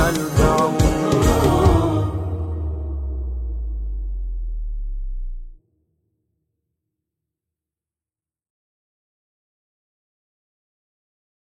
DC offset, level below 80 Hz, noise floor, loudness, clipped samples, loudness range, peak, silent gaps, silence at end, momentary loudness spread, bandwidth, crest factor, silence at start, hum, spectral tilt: under 0.1%; -28 dBFS; under -90 dBFS; -21 LUFS; under 0.1%; 19 LU; -2 dBFS; none; 6 s; 16 LU; 16 kHz; 20 dB; 0 s; none; -6.5 dB/octave